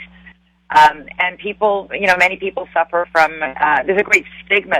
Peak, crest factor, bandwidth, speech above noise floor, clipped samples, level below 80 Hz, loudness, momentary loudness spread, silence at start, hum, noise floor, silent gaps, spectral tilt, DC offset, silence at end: 0 dBFS; 16 dB; 15.5 kHz; 31 dB; under 0.1%; -50 dBFS; -15 LUFS; 8 LU; 0 s; none; -46 dBFS; none; -3 dB/octave; under 0.1%; 0 s